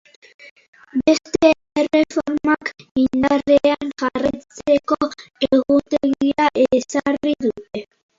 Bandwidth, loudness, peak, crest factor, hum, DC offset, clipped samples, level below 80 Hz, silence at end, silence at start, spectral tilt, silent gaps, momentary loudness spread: 7.8 kHz; -19 LUFS; 0 dBFS; 18 dB; none; under 0.1%; under 0.1%; -52 dBFS; 0.35 s; 0.95 s; -4.5 dB/octave; 2.91-2.95 s; 9 LU